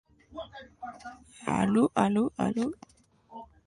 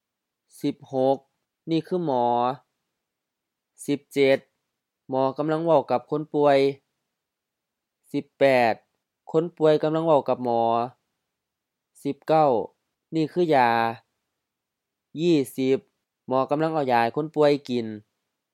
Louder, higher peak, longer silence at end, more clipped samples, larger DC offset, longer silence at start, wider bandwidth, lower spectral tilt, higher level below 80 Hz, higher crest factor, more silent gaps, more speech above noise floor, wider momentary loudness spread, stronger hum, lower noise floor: second, -28 LUFS vs -24 LUFS; second, -10 dBFS vs -6 dBFS; second, 0.25 s vs 0.55 s; neither; neither; second, 0.3 s vs 0.65 s; second, 11 kHz vs 15.5 kHz; about the same, -6.5 dB/octave vs -6.5 dB/octave; first, -60 dBFS vs -78 dBFS; about the same, 20 dB vs 20 dB; neither; second, 20 dB vs 62 dB; first, 23 LU vs 13 LU; neither; second, -49 dBFS vs -84 dBFS